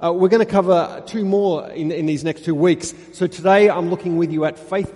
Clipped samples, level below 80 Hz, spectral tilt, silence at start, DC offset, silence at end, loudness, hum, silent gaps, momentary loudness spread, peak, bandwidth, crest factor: under 0.1%; -56 dBFS; -6.5 dB/octave; 0 s; under 0.1%; 0 s; -18 LUFS; none; none; 10 LU; -2 dBFS; 11.5 kHz; 16 dB